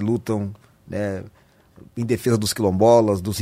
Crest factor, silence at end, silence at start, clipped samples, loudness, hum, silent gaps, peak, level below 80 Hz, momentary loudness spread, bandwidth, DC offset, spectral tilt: 18 dB; 0 s; 0 s; under 0.1%; -20 LUFS; none; none; -2 dBFS; -52 dBFS; 17 LU; 16 kHz; under 0.1%; -6 dB/octave